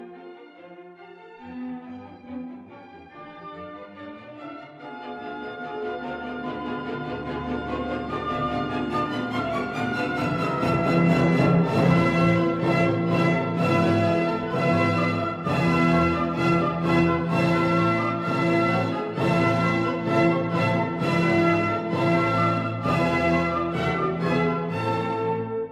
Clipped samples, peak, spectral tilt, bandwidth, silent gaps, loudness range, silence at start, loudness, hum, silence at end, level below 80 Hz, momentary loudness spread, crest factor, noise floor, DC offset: under 0.1%; -8 dBFS; -7.5 dB/octave; 10.5 kHz; none; 18 LU; 0 s; -23 LUFS; none; 0 s; -52 dBFS; 19 LU; 16 dB; -45 dBFS; under 0.1%